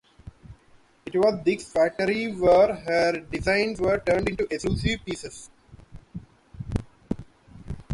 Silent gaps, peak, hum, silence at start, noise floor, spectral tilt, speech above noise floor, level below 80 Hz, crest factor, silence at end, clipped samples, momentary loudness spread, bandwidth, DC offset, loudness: none; -8 dBFS; none; 0.25 s; -57 dBFS; -5.5 dB/octave; 34 dB; -44 dBFS; 18 dB; 0 s; under 0.1%; 21 LU; 11.5 kHz; under 0.1%; -25 LUFS